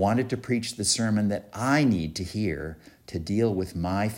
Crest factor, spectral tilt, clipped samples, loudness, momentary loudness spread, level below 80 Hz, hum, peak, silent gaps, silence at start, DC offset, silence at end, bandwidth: 16 dB; -5 dB/octave; under 0.1%; -26 LUFS; 12 LU; -50 dBFS; none; -10 dBFS; none; 0 s; under 0.1%; 0 s; 16 kHz